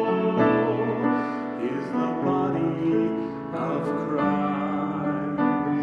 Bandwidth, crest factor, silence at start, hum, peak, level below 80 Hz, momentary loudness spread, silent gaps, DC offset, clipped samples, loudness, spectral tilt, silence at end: 6.8 kHz; 16 dB; 0 s; none; -8 dBFS; -58 dBFS; 7 LU; none; under 0.1%; under 0.1%; -25 LUFS; -9 dB/octave; 0 s